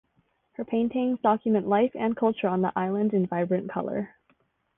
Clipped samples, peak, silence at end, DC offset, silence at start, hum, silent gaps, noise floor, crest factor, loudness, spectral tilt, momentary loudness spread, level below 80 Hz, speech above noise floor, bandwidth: under 0.1%; -10 dBFS; 0.7 s; under 0.1%; 0.6 s; none; none; -70 dBFS; 18 dB; -26 LUFS; -11 dB/octave; 9 LU; -66 dBFS; 44 dB; 3.8 kHz